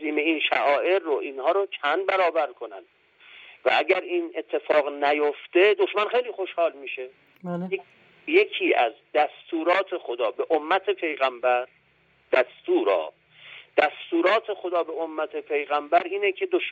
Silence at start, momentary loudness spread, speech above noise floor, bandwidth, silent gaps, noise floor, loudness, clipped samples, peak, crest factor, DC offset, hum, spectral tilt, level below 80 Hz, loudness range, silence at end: 0 s; 10 LU; 39 dB; 7.4 kHz; none; -63 dBFS; -24 LUFS; under 0.1%; -6 dBFS; 18 dB; under 0.1%; none; -6 dB/octave; -80 dBFS; 2 LU; 0 s